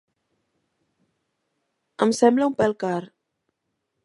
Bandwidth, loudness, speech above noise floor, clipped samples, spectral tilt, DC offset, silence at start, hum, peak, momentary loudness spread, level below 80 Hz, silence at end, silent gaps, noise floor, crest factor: 11.5 kHz; -22 LUFS; 58 dB; under 0.1%; -5.5 dB/octave; under 0.1%; 2 s; none; -4 dBFS; 10 LU; -66 dBFS; 1 s; none; -78 dBFS; 22 dB